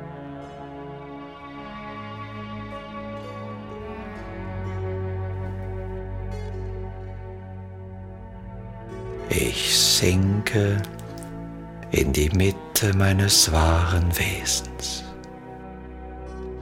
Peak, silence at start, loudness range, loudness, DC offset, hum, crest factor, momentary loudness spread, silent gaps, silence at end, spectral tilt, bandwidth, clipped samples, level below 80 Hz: -4 dBFS; 0 s; 15 LU; -23 LUFS; under 0.1%; none; 20 dB; 21 LU; none; 0 s; -3.5 dB/octave; 16.5 kHz; under 0.1%; -36 dBFS